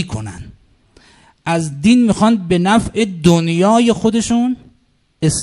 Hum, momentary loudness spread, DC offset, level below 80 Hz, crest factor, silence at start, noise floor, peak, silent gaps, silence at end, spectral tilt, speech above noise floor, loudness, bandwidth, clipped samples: none; 15 LU; under 0.1%; -40 dBFS; 16 dB; 0 s; -57 dBFS; 0 dBFS; none; 0 s; -5.5 dB/octave; 43 dB; -14 LUFS; 11.5 kHz; under 0.1%